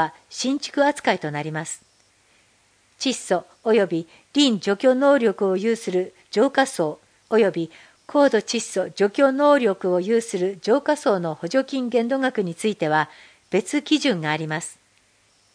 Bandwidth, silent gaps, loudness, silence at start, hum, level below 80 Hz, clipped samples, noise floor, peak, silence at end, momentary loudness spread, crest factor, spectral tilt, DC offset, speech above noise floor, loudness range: 10.5 kHz; none; -22 LUFS; 0 s; none; -74 dBFS; under 0.1%; -61 dBFS; -4 dBFS; 0.8 s; 10 LU; 18 dB; -4.5 dB/octave; under 0.1%; 39 dB; 5 LU